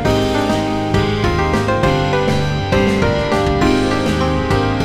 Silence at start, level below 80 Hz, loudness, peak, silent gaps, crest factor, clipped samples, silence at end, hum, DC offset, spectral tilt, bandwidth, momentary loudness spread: 0 s; -28 dBFS; -16 LUFS; -2 dBFS; none; 14 dB; under 0.1%; 0 s; none; under 0.1%; -6 dB/octave; 15.5 kHz; 2 LU